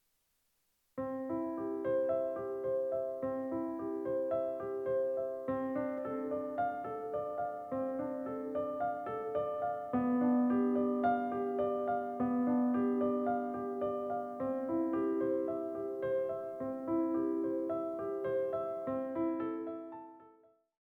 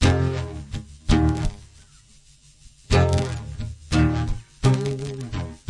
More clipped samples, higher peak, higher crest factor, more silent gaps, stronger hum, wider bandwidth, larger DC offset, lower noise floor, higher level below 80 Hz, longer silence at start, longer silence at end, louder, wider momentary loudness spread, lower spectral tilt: neither; second, -20 dBFS vs -4 dBFS; about the same, 16 dB vs 18 dB; neither; neither; second, 3.8 kHz vs 11.5 kHz; neither; first, -78 dBFS vs -52 dBFS; second, -74 dBFS vs -32 dBFS; first, 0.95 s vs 0 s; first, 0.5 s vs 0.15 s; second, -36 LUFS vs -24 LUFS; second, 7 LU vs 14 LU; first, -9 dB/octave vs -6.5 dB/octave